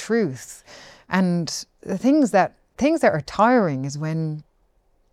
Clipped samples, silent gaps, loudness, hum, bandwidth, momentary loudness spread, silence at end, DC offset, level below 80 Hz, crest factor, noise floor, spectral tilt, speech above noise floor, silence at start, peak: under 0.1%; none; -21 LUFS; none; 14.5 kHz; 13 LU; 0.7 s; under 0.1%; -56 dBFS; 18 dB; -63 dBFS; -6 dB/octave; 42 dB; 0 s; -4 dBFS